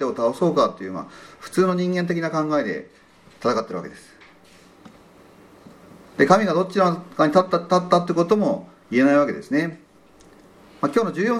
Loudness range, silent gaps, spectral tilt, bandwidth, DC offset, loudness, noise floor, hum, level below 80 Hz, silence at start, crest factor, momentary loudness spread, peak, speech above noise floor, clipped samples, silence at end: 9 LU; none; -6.5 dB/octave; 13.5 kHz; under 0.1%; -21 LUFS; -51 dBFS; none; -64 dBFS; 0 s; 22 dB; 15 LU; 0 dBFS; 31 dB; under 0.1%; 0 s